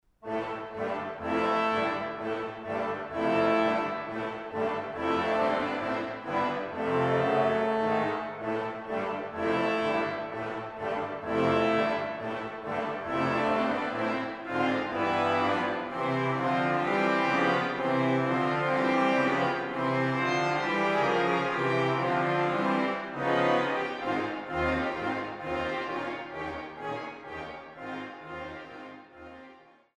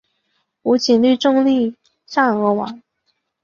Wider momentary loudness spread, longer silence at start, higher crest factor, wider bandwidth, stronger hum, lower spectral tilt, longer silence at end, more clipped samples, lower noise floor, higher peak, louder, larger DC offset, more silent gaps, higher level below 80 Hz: about the same, 11 LU vs 10 LU; second, 0.25 s vs 0.65 s; about the same, 16 dB vs 16 dB; first, 11 kHz vs 7.4 kHz; neither; first, -6.5 dB/octave vs -5 dB/octave; second, 0.4 s vs 0.65 s; neither; second, -55 dBFS vs -69 dBFS; second, -12 dBFS vs -2 dBFS; second, -29 LUFS vs -17 LUFS; neither; neither; about the same, -60 dBFS vs -62 dBFS